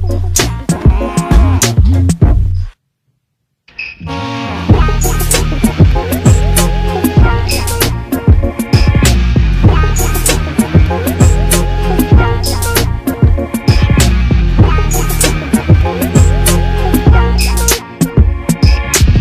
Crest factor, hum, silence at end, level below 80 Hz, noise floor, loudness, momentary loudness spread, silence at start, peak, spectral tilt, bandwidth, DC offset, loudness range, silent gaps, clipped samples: 10 dB; none; 0 s; -14 dBFS; -67 dBFS; -11 LUFS; 5 LU; 0 s; 0 dBFS; -5 dB/octave; 16 kHz; under 0.1%; 3 LU; none; 0.2%